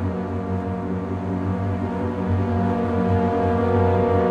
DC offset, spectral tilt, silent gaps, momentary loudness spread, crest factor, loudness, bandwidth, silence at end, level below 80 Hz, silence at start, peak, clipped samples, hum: under 0.1%; -9.5 dB/octave; none; 7 LU; 14 dB; -22 LUFS; 6.4 kHz; 0 s; -44 dBFS; 0 s; -8 dBFS; under 0.1%; none